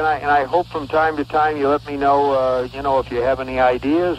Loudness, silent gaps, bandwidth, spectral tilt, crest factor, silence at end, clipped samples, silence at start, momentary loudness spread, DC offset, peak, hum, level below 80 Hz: -18 LUFS; none; 13 kHz; -6.5 dB/octave; 14 dB; 0 s; under 0.1%; 0 s; 4 LU; under 0.1%; -4 dBFS; none; -42 dBFS